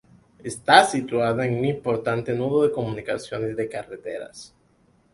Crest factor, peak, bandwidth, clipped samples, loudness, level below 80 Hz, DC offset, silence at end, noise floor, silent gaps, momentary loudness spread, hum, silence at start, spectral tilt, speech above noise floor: 22 dB; -2 dBFS; 11.5 kHz; under 0.1%; -22 LUFS; -58 dBFS; under 0.1%; 0.7 s; -61 dBFS; none; 19 LU; none; 0.45 s; -5 dB/octave; 38 dB